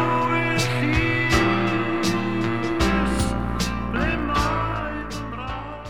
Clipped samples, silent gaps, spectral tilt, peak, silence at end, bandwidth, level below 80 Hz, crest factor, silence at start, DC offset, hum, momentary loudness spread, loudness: under 0.1%; none; -5.5 dB/octave; -6 dBFS; 0 s; 16 kHz; -32 dBFS; 18 dB; 0 s; 1%; none; 10 LU; -23 LUFS